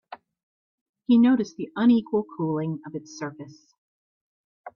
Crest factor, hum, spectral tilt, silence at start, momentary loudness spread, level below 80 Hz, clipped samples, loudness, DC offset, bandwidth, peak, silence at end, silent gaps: 16 dB; none; -7 dB/octave; 0.1 s; 19 LU; -70 dBFS; under 0.1%; -23 LUFS; under 0.1%; 6.8 kHz; -10 dBFS; 0.05 s; 0.43-0.94 s, 3.78-4.64 s